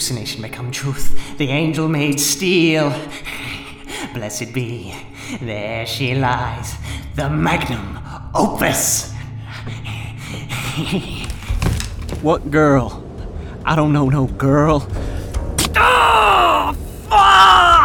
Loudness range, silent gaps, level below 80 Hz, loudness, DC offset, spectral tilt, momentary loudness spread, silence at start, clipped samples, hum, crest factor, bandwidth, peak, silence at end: 8 LU; none; -30 dBFS; -16 LUFS; under 0.1%; -4 dB/octave; 18 LU; 0 s; under 0.1%; none; 16 dB; over 20 kHz; -2 dBFS; 0 s